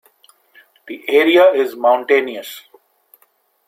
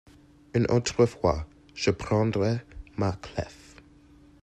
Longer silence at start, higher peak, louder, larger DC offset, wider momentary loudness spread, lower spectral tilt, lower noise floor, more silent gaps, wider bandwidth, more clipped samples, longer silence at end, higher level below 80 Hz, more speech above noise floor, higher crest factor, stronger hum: first, 0.85 s vs 0.55 s; first, -2 dBFS vs -8 dBFS; first, -14 LUFS vs -27 LUFS; neither; first, 22 LU vs 12 LU; second, -3.5 dB/octave vs -6 dB/octave; first, -60 dBFS vs -55 dBFS; neither; first, 16 kHz vs 11 kHz; neither; first, 1.1 s vs 0.9 s; second, -68 dBFS vs -48 dBFS; first, 45 dB vs 29 dB; about the same, 16 dB vs 20 dB; neither